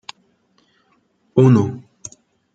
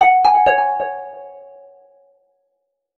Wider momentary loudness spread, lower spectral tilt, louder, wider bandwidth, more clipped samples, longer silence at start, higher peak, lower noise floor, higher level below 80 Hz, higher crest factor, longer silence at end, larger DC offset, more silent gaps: about the same, 24 LU vs 24 LU; first, -8 dB/octave vs -3.5 dB/octave; about the same, -16 LUFS vs -15 LUFS; first, 7.8 kHz vs 7 kHz; neither; first, 1.35 s vs 0 s; about the same, -2 dBFS vs -2 dBFS; second, -62 dBFS vs -72 dBFS; about the same, -58 dBFS vs -54 dBFS; about the same, 18 dB vs 16 dB; second, 0.75 s vs 1.6 s; neither; neither